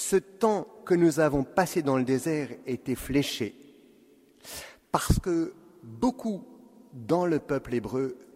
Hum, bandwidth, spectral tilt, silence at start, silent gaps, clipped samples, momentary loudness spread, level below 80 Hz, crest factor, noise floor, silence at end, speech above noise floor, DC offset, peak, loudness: none; 16 kHz; -5.5 dB/octave; 0 s; none; under 0.1%; 12 LU; -44 dBFS; 22 dB; -59 dBFS; 0.1 s; 31 dB; under 0.1%; -6 dBFS; -28 LUFS